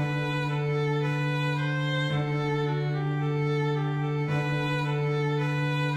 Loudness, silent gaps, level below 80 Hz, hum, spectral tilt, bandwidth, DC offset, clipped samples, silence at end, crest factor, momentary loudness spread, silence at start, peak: -28 LUFS; none; -58 dBFS; none; -7 dB/octave; 8.4 kHz; under 0.1%; under 0.1%; 0 s; 10 dB; 1 LU; 0 s; -18 dBFS